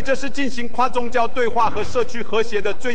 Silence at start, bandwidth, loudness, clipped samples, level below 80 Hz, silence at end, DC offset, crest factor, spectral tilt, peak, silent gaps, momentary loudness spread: 0 s; 9.4 kHz; -22 LUFS; under 0.1%; -42 dBFS; 0 s; 20%; 14 dB; -4.5 dB/octave; -6 dBFS; none; 5 LU